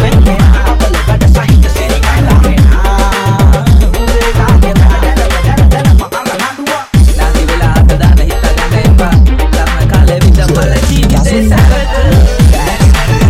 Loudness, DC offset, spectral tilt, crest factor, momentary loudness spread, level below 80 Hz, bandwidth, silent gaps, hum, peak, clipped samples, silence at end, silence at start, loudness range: -8 LUFS; 0.9%; -6 dB/octave; 6 dB; 4 LU; -8 dBFS; 15.5 kHz; none; none; 0 dBFS; 0.2%; 0 s; 0 s; 1 LU